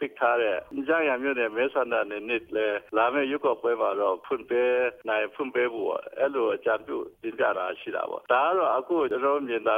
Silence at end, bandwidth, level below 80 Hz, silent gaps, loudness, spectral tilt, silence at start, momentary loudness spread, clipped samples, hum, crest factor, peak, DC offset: 0 s; 4.7 kHz; -70 dBFS; none; -27 LUFS; -6 dB/octave; 0 s; 7 LU; under 0.1%; none; 18 dB; -10 dBFS; under 0.1%